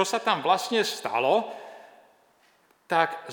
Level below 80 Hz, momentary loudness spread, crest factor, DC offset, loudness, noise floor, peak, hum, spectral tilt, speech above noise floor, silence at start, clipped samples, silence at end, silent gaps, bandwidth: -90 dBFS; 15 LU; 22 dB; under 0.1%; -25 LUFS; -63 dBFS; -6 dBFS; none; -3 dB/octave; 38 dB; 0 s; under 0.1%; 0 s; none; over 20 kHz